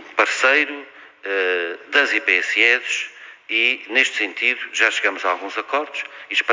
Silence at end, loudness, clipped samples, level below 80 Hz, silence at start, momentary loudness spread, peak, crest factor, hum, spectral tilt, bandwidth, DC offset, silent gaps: 0 s; -18 LUFS; under 0.1%; -82 dBFS; 0 s; 10 LU; -2 dBFS; 20 dB; none; 0.5 dB/octave; 7.6 kHz; under 0.1%; none